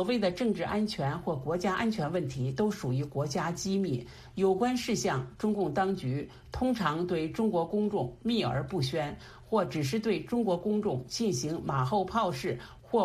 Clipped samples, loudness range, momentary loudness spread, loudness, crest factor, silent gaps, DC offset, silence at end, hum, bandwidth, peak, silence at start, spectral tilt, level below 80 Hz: under 0.1%; 1 LU; 5 LU; -31 LUFS; 16 dB; none; under 0.1%; 0 s; none; 15 kHz; -14 dBFS; 0 s; -6 dB/octave; -56 dBFS